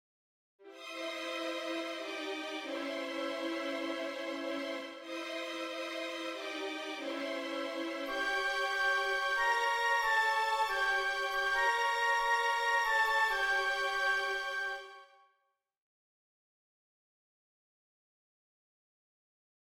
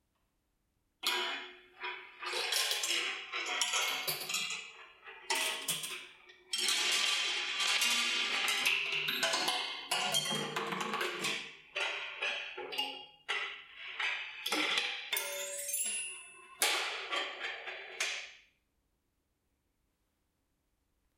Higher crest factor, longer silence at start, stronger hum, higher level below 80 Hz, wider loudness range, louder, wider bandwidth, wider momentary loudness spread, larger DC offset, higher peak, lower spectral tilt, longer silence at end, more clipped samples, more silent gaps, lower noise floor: second, 16 dB vs 24 dB; second, 0.6 s vs 1.05 s; neither; first, -68 dBFS vs -84 dBFS; about the same, 9 LU vs 7 LU; about the same, -33 LUFS vs -33 LUFS; about the same, 16 kHz vs 16.5 kHz; second, 10 LU vs 13 LU; neither; second, -20 dBFS vs -14 dBFS; about the same, -0.5 dB/octave vs 0.5 dB/octave; first, 4.7 s vs 2.8 s; neither; neither; about the same, -81 dBFS vs -80 dBFS